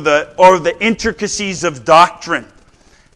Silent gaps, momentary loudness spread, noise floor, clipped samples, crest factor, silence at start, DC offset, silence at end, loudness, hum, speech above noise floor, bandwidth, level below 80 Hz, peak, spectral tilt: none; 11 LU; -48 dBFS; 0.6%; 14 dB; 0 s; under 0.1%; 0.7 s; -13 LUFS; none; 35 dB; 12 kHz; -44 dBFS; 0 dBFS; -3.5 dB/octave